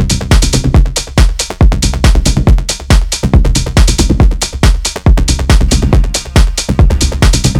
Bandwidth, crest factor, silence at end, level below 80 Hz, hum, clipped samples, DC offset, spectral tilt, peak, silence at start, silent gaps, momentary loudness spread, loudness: 13.5 kHz; 8 dB; 0 s; -10 dBFS; none; under 0.1%; under 0.1%; -4.5 dB/octave; 0 dBFS; 0 s; none; 2 LU; -11 LUFS